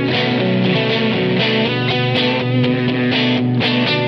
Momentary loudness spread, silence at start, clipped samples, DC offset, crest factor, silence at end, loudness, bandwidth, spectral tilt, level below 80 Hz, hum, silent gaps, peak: 1 LU; 0 s; under 0.1%; under 0.1%; 12 dB; 0 s; -16 LUFS; 6.4 kHz; -7.5 dB/octave; -54 dBFS; none; none; -4 dBFS